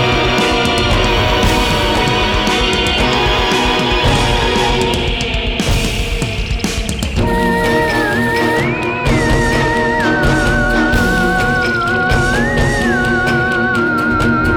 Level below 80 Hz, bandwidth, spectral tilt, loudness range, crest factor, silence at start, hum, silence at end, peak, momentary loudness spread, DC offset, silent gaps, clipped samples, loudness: -22 dBFS; over 20 kHz; -4.5 dB/octave; 3 LU; 14 dB; 0 s; none; 0 s; 0 dBFS; 4 LU; 0.2%; none; under 0.1%; -14 LUFS